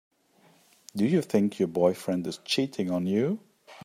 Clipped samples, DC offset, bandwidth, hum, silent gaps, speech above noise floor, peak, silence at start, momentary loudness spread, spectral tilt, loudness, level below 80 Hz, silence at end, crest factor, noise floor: under 0.1%; under 0.1%; 15.5 kHz; none; none; 36 dB; -8 dBFS; 0.95 s; 6 LU; -6 dB/octave; -27 LUFS; -72 dBFS; 0 s; 20 dB; -62 dBFS